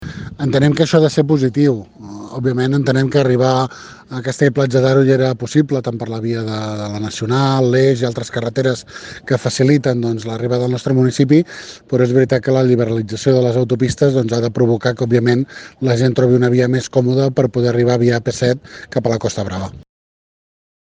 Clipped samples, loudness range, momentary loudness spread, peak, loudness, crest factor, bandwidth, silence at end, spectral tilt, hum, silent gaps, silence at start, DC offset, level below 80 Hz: under 0.1%; 3 LU; 10 LU; 0 dBFS; -16 LUFS; 16 dB; 9.4 kHz; 1.05 s; -6.5 dB/octave; none; none; 0 s; under 0.1%; -48 dBFS